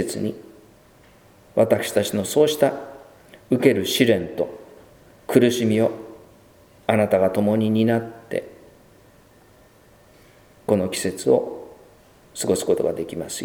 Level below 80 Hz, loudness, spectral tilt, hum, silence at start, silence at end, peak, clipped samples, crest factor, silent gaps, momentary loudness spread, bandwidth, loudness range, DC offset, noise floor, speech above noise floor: -60 dBFS; -21 LUFS; -5 dB/octave; none; 0 s; 0 s; 0 dBFS; under 0.1%; 22 dB; none; 16 LU; over 20 kHz; 6 LU; under 0.1%; -52 dBFS; 32 dB